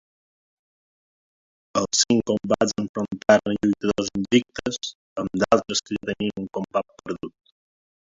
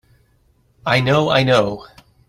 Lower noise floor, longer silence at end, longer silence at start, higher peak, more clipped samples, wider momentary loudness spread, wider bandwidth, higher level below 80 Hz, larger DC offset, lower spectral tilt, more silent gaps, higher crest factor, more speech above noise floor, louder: first, under -90 dBFS vs -58 dBFS; first, 0.7 s vs 0.45 s; first, 1.75 s vs 0.85 s; about the same, -4 dBFS vs -2 dBFS; neither; about the same, 13 LU vs 13 LU; second, 7.8 kHz vs 14 kHz; second, -56 dBFS vs -50 dBFS; neither; second, -4 dB/octave vs -6 dB/octave; first, 2.89-2.94 s, 4.95-5.16 s vs none; about the same, 22 dB vs 18 dB; first, over 67 dB vs 42 dB; second, -23 LUFS vs -16 LUFS